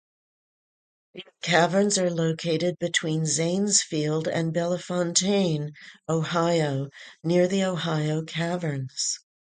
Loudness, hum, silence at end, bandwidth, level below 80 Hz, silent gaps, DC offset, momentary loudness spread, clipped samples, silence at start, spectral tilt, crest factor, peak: -25 LUFS; none; 0.25 s; 9.6 kHz; -68 dBFS; none; under 0.1%; 9 LU; under 0.1%; 1.15 s; -4 dB/octave; 20 dB; -6 dBFS